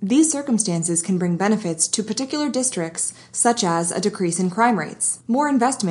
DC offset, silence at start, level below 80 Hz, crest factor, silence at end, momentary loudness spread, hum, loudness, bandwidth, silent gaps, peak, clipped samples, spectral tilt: under 0.1%; 0 s; -70 dBFS; 16 dB; 0 s; 5 LU; none; -20 LUFS; 11.5 kHz; none; -4 dBFS; under 0.1%; -4 dB/octave